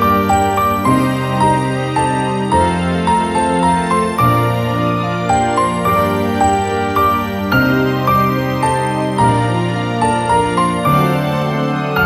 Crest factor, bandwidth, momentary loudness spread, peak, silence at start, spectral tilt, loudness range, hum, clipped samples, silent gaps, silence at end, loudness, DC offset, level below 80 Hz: 12 dB; over 20 kHz; 3 LU; -2 dBFS; 0 s; -6 dB/octave; 0 LU; none; under 0.1%; none; 0 s; -15 LUFS; under 0.1%; -36 dBFS